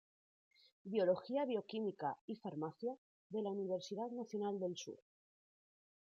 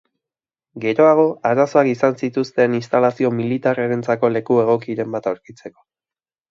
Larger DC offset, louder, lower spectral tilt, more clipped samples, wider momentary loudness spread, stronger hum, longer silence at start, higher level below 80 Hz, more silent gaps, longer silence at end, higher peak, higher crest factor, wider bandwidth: neither; second, -42 LUFS vs -18 LUFS; second, -6 dB/octave vs -7.5 dB/octave; neither; first, 12 LU vs 9 LU; neither; about the same, 0.85 s vs 0.75 s; second, under -90 dBFS vs -66 dBFS; first, 2.21-2.28 s, 2.98-3.30 s vs none; first, 1.15 s vs 0.8 s; second, -24 dBFS vs 0 dBFS; about the same, 20 dB vs 18 dB; about the same, 7.4 kHz vs 7.6 kHz